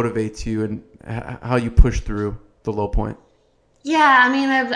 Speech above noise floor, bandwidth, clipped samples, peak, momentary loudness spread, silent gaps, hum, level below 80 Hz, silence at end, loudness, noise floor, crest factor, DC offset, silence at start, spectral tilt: 41 dB; 10 kHz; under 0.1%; 0 dBFS; 17 LU; none; none; -24 dBFS; 0 s; -19 LUFS; -59 dBFS; 20 dB; under 0.1%; 0 s; -6 dB/octave